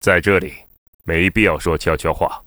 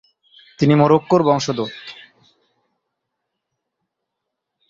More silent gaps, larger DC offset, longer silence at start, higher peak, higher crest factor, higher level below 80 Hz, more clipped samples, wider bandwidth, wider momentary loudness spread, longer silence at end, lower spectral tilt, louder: first, 0.78-0.99 s vs none; neither; second, 0.05 s vs 0.6 s; about the same, 0 dBFS vs 0 dBFS; about the same, 18 dB vs 20 dB; first, -34 dBFS vs -58 dBFS; neither; first, over 20 kHz vs 7.6 kHz; second, 10 LU vs 18 LU; second, 0.05 s vs 2.8 s; about the same, -5.5 dB/octave vs -6.5 dB/octave; about the same, -17 LUFS vs -17 LUFS